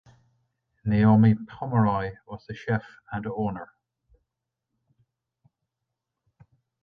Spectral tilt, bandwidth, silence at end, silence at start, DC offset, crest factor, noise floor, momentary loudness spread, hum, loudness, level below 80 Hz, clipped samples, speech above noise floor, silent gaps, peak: -10.5 dB/octave; 4.9 kHz; 3.2 s; 0.85 s; under 0.1%; 20 dB; -84 dBFS; 20 LU; none; -25 LUFS; -54 dBFS; under 0.1%; 60 dB; none; -6 dBFS